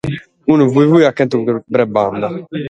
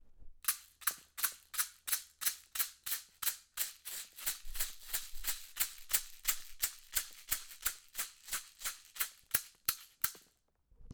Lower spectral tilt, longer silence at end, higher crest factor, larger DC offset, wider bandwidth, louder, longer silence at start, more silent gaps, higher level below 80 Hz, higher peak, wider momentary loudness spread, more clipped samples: first, -8 dB/octave vs 2 dB/octave; about the same, 0 s vs 0 s; second, 14 dB vs 28 dB; neither; second, 8.6 kHz vs over 20 kHz; first, -14 LUFS vs -37 LUFS; about the same, 0.05 s vs 0.05 s; neither; first, -50 dBFS vs -56 dBFS; first, 0 dBFS vs -14 dBFS; first, 11 LU vs 7 LU; neither